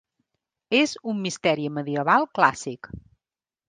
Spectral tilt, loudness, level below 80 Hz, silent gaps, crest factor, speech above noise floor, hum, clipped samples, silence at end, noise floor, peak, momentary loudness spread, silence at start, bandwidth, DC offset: -4.5 dB/octave; -23 LUFS; -58 dBFS; none; 24 dB; over 67 dB; none; under 0.1%; 0.7 s; under -90 dBFS; -2 dBFS; 14 LU; 0.7 s; 9.8 kHz; under 0.1%